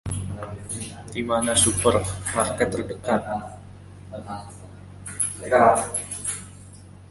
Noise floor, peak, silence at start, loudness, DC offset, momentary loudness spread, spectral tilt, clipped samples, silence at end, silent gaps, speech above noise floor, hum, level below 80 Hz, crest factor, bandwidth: -44 dBFS; -2 dBFS; 0.05 s; -23 LUFS; under 0.1%; 24 LU; -3.5 dB/octave; under 0.1%; 0.05 s; none; 22 dB; none; -44 dBFS; 22 dB; 12 kHz